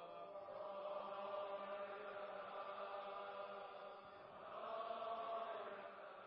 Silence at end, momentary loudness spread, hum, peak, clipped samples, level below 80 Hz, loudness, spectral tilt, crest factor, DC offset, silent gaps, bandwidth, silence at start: 0 s; 8 LU; none; -36 dBFS; under 0.1%; under -90 dBFS; -51 LUFS; -1.5 dB/octave; 14 dB; under 0.1%; none; 5.6 kHz; 0 s